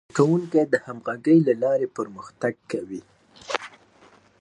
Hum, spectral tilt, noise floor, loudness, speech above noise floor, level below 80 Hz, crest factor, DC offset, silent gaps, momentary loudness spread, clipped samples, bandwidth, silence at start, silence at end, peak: none; -7 dB/octave; -55 dBFS; -24 LUFS; 32 dB; -70 dBFS; 20 dB; under 0.1%; none; 15 LU; under 0.1%; 10.5 kHz; 0.15 s; 0.75 s; -4 dBFS